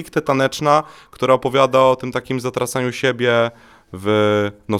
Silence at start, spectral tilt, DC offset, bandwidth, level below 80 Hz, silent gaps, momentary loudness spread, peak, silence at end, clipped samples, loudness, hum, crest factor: 0 s; -5 dB/octave; under 0.1%; 15 kHz; -54 dBFS; none; 8 LU; 0 dBFS; 0 s; under 0.1%; -18 LUFS; none; 18 dB